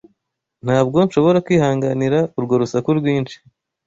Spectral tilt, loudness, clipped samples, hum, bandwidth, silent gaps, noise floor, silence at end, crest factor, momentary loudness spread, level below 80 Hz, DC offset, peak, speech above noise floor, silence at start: -7.5 dB/octave; -17 LUFS; under 0.1%; none; 7.8 kHz; none; -74 dBFS; 0.5 s; 16 dB; 6 LU; -54 dBFS; under 0.1%; -2 dBFS; 57 dB; 0.65 s